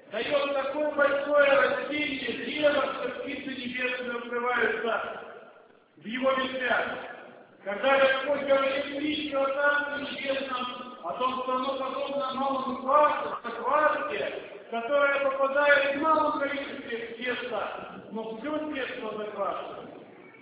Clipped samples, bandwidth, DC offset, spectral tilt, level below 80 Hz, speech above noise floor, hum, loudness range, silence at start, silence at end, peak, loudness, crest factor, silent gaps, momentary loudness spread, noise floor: under 0.1%; 4 kHz; under 0.1%; -7 dB/octave; -68 dBFS; 28 dB; none; 5 LU; 0.05 s; 0 s; -8 dBFS; -28 LUFS; 20 dB; none; 14 LU; -56 dBFS